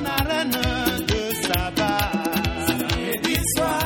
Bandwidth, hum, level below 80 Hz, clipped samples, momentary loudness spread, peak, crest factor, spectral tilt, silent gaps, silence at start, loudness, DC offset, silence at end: 19 kHz; none; -34 dBFS; under 0.1%; 2 LU; -4 dBFS; 18 dB; -4 dB/octave; none; 0 s; -22 LUFS; under 0.1%; 0 s